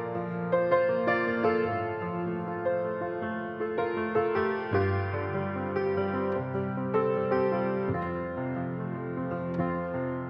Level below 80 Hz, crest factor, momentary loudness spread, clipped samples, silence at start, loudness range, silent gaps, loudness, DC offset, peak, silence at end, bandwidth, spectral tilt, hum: -62 dBFS; 18 dB; 7 LU; under 0.1%; 0 s; 2 LU; none; -30 LUFS; under 0.1%; -12 dBFS; 0 s; 5.8 kHz; -10 dB/octave; none